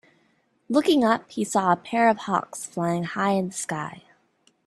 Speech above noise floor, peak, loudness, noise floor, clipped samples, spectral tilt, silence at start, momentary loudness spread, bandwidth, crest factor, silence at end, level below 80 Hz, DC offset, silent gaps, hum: 43 dB; -6 dBFS; -24 LUFS; -66 dBFS; under 0.1%; -5 dB/octave; 0.7 s; 10 LU; 13.5 kHz; 20 dB; 0.7 s; -66 dBFS; under 0.1%; none; none